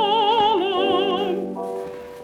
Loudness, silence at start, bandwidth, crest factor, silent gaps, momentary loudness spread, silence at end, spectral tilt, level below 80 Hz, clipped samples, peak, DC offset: -21 LUFS; 0 s; 13 kHz; 14 dB; none; 12 LU; 0 s; -5.5 dB/octave; -60 dBFS; under 0.1%; -8 dBFS; under 0.1%